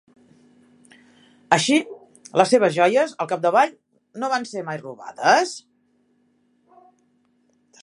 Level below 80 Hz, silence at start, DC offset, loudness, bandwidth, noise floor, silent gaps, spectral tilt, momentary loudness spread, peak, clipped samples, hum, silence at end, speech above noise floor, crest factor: -70 dBFS; 1.5 s; under 0.1%; -20 LUFS; 11.5 kHz; -64 dBFS; none; -4 dB/octave; 19 LU; 0 dBFS; under 0.1%; none; 2.25 s; 45 dB; 22 dB